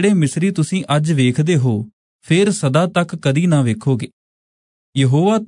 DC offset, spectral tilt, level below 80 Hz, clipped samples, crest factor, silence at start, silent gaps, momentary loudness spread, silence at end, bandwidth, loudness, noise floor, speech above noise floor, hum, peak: under 0.1%; -6.5 dB/octave; -60 dBFS; under 0.1%; 14 dB; 0 s; 1.93-2.19 s, 4.13-4.93 s; 7 LU; 0 s; 11 kHz; -17 LUFS; under -90 dBFS; over 75 dB; none; -2 dBFS